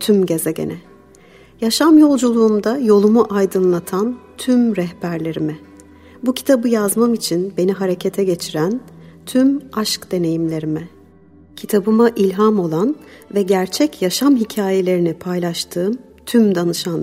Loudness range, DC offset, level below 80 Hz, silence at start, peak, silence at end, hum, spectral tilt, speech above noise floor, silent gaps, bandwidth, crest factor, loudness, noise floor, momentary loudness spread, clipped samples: 5 LU; under 0.1%; -56 dBFS; 0 s; -2 dBFS; 0 s; none; -5.5 dB/octave; 30 dB; none; 16 kHz; 14 dB; -17 LUFS; -46 dBFS; 10 LU; under 0.1%